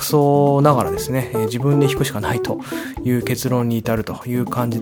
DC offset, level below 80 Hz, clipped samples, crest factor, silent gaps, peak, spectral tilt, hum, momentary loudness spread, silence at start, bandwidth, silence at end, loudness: under 0.1%; -44 dBFS; under 0.1%; 18 dB; none; 0 dBFS; -6.5 dB/octave; none; 9 LU; 0 s; 19 kHz; 0 s; -19 LUFS